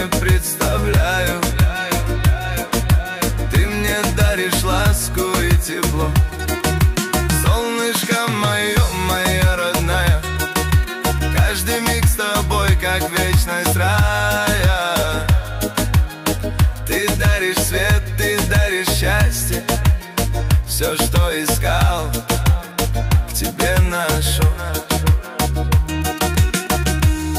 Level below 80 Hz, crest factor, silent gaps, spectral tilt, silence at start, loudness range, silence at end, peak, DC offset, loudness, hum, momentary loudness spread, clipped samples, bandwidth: -22 dBFS; 14 dB; none; -4.5 dB/octave; 0 s; 1 LU; 0 s; -2 dBFS; under 0.1%; -17 LUFS; none; 4 LU; under 0.1%; 16 kHz